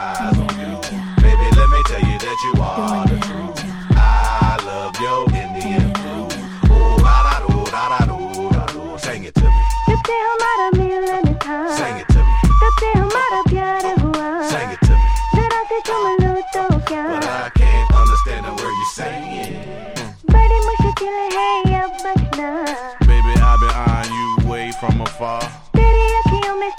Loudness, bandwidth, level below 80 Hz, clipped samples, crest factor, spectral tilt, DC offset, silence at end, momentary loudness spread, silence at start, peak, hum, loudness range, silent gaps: -17 LUFS; 11 kHz; -18 dBFS; under 0.1%; 14 dB; -6.5 dB/octave; under 0.1%; 0 s; 10 LU; 0 s; 0 dBFS; none; 2 LU; none